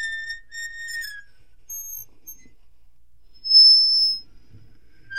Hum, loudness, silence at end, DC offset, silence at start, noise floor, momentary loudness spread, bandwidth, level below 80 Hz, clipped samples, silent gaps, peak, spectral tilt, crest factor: none; -13 LUFS; 0 s; 0.7%; 0 s; -57 dBFS; 25 LU; 16.5 kHz; -56 dBFS; under 0.1%; none; -6 dBFS; 3 dB/octave; 18 dB